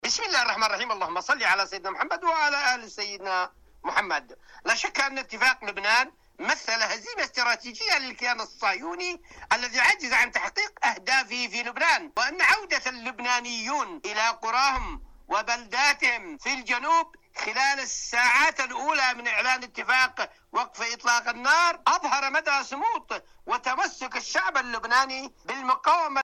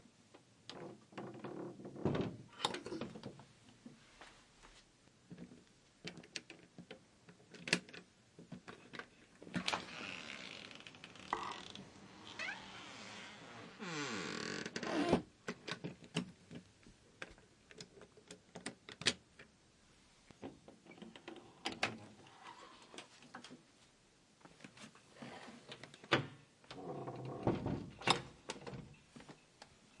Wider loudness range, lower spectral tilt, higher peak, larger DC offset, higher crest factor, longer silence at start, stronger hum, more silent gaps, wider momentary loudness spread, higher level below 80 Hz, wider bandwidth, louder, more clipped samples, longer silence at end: second, 3 LU vs 13 LU; second, 0 dB/octave vs -4 dB/octave; about the same, -12 dBFS vs -12 dBFS; neither; second, 14 dB vs 34 dB; about the same, 0.05 s vs 0 s; neither; neither; second, 10 LU vs 23 LU; first, -54 dBFS vs -72 dBFS; first, 15.5 kHz vs 11.5 kHz; first, -25 LUFS vs -44 LUFS; neither; about the same, 0 s vs 0 s